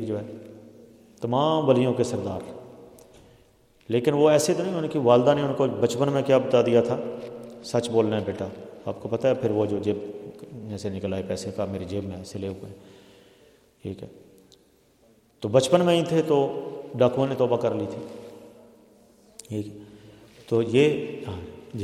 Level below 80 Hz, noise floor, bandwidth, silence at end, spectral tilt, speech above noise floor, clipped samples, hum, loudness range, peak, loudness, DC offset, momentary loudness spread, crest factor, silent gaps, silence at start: -64 dBFS; -60 dBFS; 14.5 kHz; 0 s; -6 dB/octave; 36 dB; under 0.1%; none; 11 LU; -4 dBFS; -24 LUFS; under 0.1%; 20 LU; 22 dB; none; 0 s